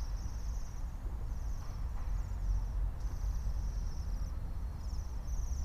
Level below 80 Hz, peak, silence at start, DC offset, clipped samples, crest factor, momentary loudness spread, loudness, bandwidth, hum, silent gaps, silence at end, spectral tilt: -36 dBFS; -24 dBFS; 0 s; under 0.1%; under 0.1%; 12 dB; 4 LU; -41 LUFS; 13 kHz; none; none; 0 s; -6 dB/octave